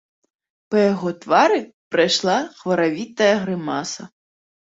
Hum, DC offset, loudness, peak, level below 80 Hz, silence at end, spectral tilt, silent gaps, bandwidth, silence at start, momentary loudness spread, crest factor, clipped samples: none; under 0.1%; -20 LUFS; -2 dBFS; -64 dBFS; 0.65 s; -4.5 dB/octave; 1.74-1.91 s; 8 kHz; 0.7 s; 9 LU; 18 dB; under 0.1%